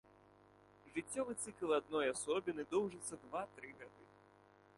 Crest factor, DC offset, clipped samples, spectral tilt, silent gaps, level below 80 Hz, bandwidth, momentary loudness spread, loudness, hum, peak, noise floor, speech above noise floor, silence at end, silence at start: 18 dB; under 0.1%; under 0.1%; -3.5 dB/octave; none; -78 dBFS; 11.5 kHz; 15 LU; -41 LUFS; 50 Hz at -65 dBFS; -24 dBFS; -67 dBFS; 26 dB; 0.75 s; 0.85 s